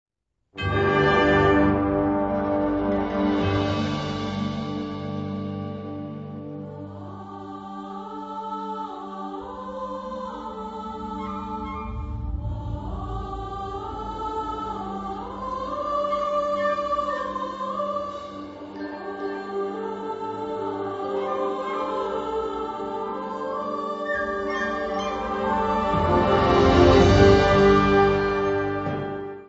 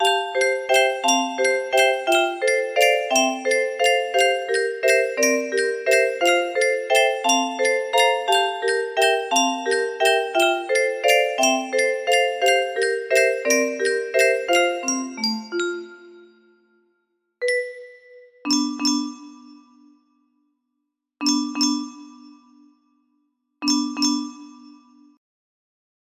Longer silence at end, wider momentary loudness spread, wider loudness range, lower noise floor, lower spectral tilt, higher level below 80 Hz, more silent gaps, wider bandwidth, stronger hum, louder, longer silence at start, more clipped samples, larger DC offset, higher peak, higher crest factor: second, 0 s vs 1.5 s; first, 16 LU vs 7 LU; first, 15 LU vs 9 LU; second, -61 dBFS vs -78 dBFS; first, -7 dB/octave vs -0.5 dB/octave; first, -38 dBFS vs -70 dBFS; neither; second, 8 kHz vs 15.5 kHz; neither; second, -24 LUFS vs -20 LUFS; first, 0.55 s vs 0 s; neither; neither; about the same, -4 dBFS vs -2 dBFS; about the same, 20 dB vs 18 dB